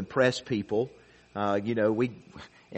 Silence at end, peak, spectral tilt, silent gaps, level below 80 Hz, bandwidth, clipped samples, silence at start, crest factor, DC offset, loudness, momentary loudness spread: 0 s; -10 dBFS; -6 dB/octave; none; -64 dBFS; 8.4 kHz; under 0.1%; 0 s; 20 dB; under 0.1%; -29 LUFS; 20 LU